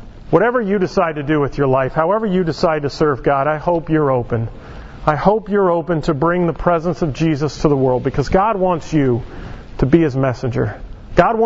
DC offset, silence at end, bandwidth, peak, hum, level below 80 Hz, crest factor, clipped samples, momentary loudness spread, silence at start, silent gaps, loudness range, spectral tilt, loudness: under 0.1%; 0 s; 7.8 kHz; 0 dBFS; none; -34 dBFS; 16 dB; under 0.1%; 7 LU; 0 s; none; 1 LU; -7.5 dB/octave; -17 LUFS